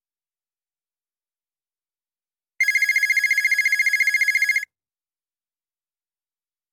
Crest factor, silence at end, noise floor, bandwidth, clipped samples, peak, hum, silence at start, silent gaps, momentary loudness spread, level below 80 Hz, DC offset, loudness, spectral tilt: 16 dB; 2.1 s; under -90 dBFS; 17 kHz; under 0.1%; -10 dBFS; none; 2.6 s; none; 4 LU; -80 dBFS; under 0.1%; -18 LUFS; 4.5 dB/octave